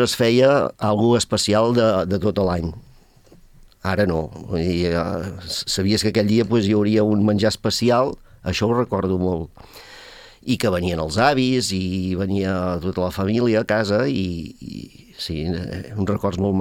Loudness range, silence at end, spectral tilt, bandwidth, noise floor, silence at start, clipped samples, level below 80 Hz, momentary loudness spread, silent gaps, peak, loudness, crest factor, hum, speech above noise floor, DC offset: 4 LU; 0 s; -5.5 dB/octave; 16.5 kHz; -49 dBFS; 0 s; under 0.1%; -46 dBFS; 13 LU; none; -2 dBFS; -20 LUFS; 18 dB; none; 30 dB; under 0.1%